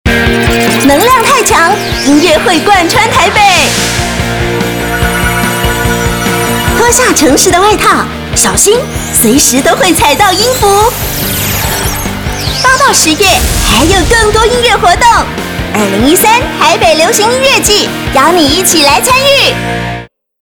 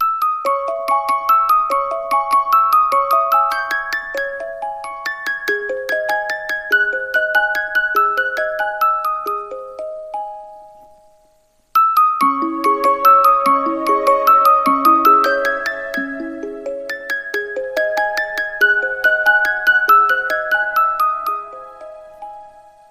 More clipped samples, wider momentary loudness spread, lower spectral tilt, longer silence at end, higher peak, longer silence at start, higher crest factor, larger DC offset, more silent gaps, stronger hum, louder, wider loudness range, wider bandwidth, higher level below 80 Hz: first, 2% vs under 0.1%; second, 7 LU vs 15 LU; about the same, -3 dB/octave vs -2 dB/octave; about the same, 0.35 s vs 0.3 s; about the same, 0 dBFS vs -2 dBFS; about the same, 0.05 s vs 0 s; second, 8 dB vs 16 dB; neither; neither; neither; first, -7 LUFS vs -16 LUFS; second, 2 LU vs 7 LU; first, over 20 kHz vs 15.5 kHz; first, -22 dBFS vs -56 dBFS